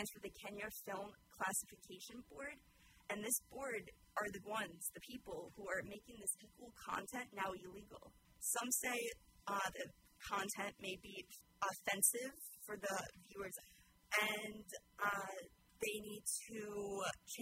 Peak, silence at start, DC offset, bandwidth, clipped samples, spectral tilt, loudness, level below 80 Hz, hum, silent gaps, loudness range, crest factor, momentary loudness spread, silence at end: -20 dBFS; 0 s; under 0.1%; 16 kHz; under 0.1%; -1.5 dB/octave; -44 LUFS; -74 dBFS; none; none; 5 LU; 26 dB; 16 LU; 0 s